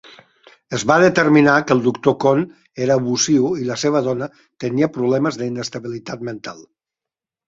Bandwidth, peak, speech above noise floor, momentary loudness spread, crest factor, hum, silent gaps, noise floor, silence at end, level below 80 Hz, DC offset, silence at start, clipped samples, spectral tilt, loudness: 8 kHz; -2 dBFS; 70 dB; 16 LU; 18 dB; none; none; -88 dBFS; 0.85 s; -58 dBFS; under 0.1%; 0.7 s; under 0.1%; -5 dB/octave; -17 LUFS